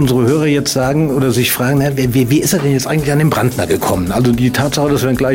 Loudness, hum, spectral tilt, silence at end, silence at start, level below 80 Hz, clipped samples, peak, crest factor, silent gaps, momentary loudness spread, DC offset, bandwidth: -13 LUFS; none; -5.5 dB/octave; 0 s; 0 s; -36 dBFS; under 0.1%; -2 dBFS; 10 dB; none; 2 LU; under 0.1%; 16.5 kHz